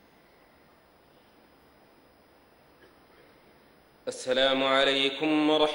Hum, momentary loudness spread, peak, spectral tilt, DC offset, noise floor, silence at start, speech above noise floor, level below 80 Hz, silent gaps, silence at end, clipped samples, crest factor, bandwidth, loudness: none; 15 LU; -10 dBFS; -3.5 dB/octave; under 0.1%; -60 dBFS; 4.05 s; 35 dB; -66 dBFS; none; 0 s; under 0.1%; 20 dB; 16 kHz; -25 LUFS